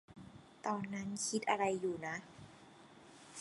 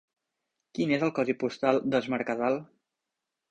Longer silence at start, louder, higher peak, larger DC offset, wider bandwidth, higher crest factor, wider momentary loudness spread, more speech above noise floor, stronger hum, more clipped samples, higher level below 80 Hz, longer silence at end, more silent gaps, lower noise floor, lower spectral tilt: second, 0.1 s vs 0.75 s; second, -39 LUFS vs -28 LUFS; second, -16 dBFS vs -10 dBFS; neither; first, 11.5 kHz vs 8.8 kHz; about the same, 24 dB vs 20 dB; first, 24 LU vs 6 LU; second, 21 dB vs 59 dB; neither; neither; second, -74 dBFS vs -68 dBFS; second, 0 s vs 0.85 s; neither; second, -60 dBFS vs -86 dBFS; second, -4 dB/octave vs -6.5 dB/octave